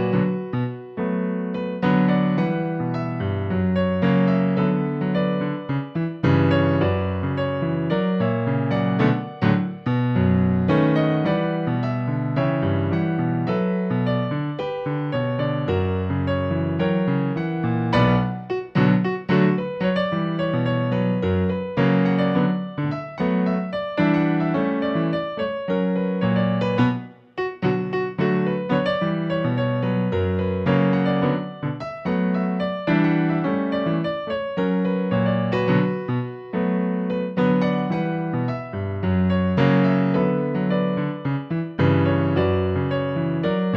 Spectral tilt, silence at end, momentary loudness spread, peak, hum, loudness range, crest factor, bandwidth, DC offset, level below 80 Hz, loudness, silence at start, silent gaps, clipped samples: -9.5 dB/octave; 0 s; 7 LU; -6 dBFS; none; 2 LU; 16 dB; 5.8 kHz; under 0.1%; -52 dBFS; -22 LUFS; 0 s; none; under 0.1%